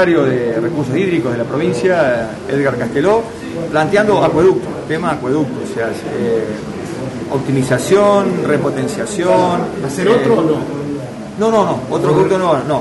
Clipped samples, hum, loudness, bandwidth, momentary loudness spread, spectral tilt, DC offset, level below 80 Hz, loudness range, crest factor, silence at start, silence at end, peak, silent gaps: under 0.1%; none; -15 LUFS; 11.5 kHz; 10 LU; -6 dB/octave; under 0.1%; -46 dBFS; 2 LU; 12 dB; 0 s; 0 s; -2 dBFS; none